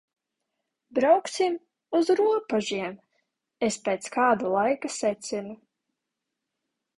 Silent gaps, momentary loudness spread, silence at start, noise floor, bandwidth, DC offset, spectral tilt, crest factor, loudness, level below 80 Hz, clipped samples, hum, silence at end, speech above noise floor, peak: none; 11 LU; 0.9 s; -84 dBFS; 11.5 kHz; under 0.1%; -4 dB/octave; 20 dB; -26 LUFS; -70 dBFS; under 0.1%; none; 1.4 s; 60 dB; -8 dBFS